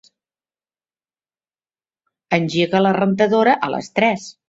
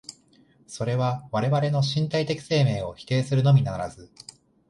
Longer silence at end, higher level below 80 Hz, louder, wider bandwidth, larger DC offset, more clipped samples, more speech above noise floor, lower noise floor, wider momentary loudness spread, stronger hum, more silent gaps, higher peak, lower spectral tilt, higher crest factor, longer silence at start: second, 0.2 s vs 0.65 s; second, -62 dBFS vs -54 dBFS; first, -17 LUFS vs -24 LUFS; second, 8 kHz vs 11 kHz; neither; neither; first, over 73 dB vs 35 dB; first, under -90 dBFS vs -59 dBFS; second, 5 LU vs 23 LU; neither; neither; first, -2 dBFS vs -10 dBFS; about the same, -6 dB/octave vs -6.5 dB/octave; about the same, 18 dB vs 16 dB; first, 2.3 s vs 0.1 s